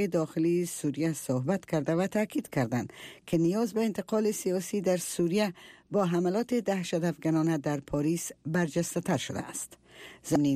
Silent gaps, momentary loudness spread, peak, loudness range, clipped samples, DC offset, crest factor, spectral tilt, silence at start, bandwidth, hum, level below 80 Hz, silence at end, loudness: none; 7 LU; -12 dBFS; 1 LU; under 0.1%; under 0.1%; 16 dB; -6 dB/octave; 0 s; 15.5 kHz; none; -64 dBFS; 0 s; -30 LUFS